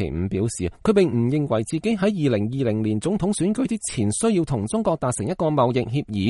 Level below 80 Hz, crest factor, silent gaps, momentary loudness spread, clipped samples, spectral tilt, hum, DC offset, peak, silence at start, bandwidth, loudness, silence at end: -46 dBFS; 16 dB; none; 5 LU; under 0.1%; -6 dB/octave; none; under 0.1%; -6 dBFS; 0 s; 11.5 kHz; -22 LUFS; 0 s